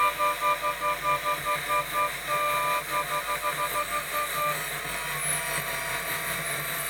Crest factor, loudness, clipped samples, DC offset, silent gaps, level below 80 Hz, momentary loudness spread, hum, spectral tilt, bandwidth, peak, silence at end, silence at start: 16 dB; -27 LUFS; under 0.1%; under 0.1%; none; -54 dBFS; 3 LU; none; -1.5 dB/octave; over 20 kHz; -14 dBFS; 0 s; 0 s